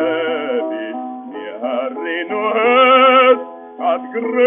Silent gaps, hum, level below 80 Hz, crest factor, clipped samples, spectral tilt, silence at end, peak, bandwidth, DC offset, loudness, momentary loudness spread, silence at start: none; none; -70 dBFS; 16 dB; under 0.1%; 0 dB/octave; 0 s; 0 dBFS; 3.7 kHz; under 0.1%; -15 LUFS; 18 LU; 0 s